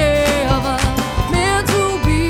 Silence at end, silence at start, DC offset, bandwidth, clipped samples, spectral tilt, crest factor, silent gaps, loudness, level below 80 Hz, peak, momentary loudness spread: 0 s; 0 s; under 0.1%; 19 kHz; under 0.1%; -5 dB/octave; 14 dB; none; -16 LUFS; -24 dBFS; 0 dBFS; 3 LU